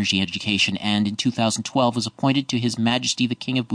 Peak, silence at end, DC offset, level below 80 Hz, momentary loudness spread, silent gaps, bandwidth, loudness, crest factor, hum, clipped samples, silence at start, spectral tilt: -6 dBFS; 0 s; under 0.1%; -60 dBFS; 3 LU; none; 10 kHz; -22 LUFS; 16 dB; none; under 0.1%; 0 s; -4 dB/octave